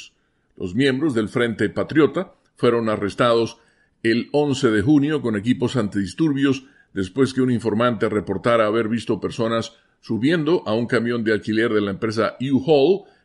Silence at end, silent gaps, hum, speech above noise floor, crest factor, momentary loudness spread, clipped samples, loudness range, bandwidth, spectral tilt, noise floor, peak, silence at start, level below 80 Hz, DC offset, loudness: 0.25 s; none; none; 43 dB; 16 dB; 8 LU; under 0.1%; 1 LU; 11.5 kHz; -6.5 dB/octave; -63 dBFS; -4 dBFS; 0 s; -56 dBFS; under 0.1%; -20 LUFS